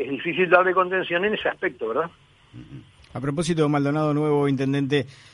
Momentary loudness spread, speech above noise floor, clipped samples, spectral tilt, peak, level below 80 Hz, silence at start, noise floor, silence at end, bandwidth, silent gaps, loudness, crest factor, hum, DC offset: 12 LU; 22 dB; under 0.1%; -6.5 dB/octave; -2 dBFS; -58 dBFS; 0 s; -44 dBFS; 0.2 s; 11.5 kHz; none; -22 LUFS; 22 dB; none; under 0.1%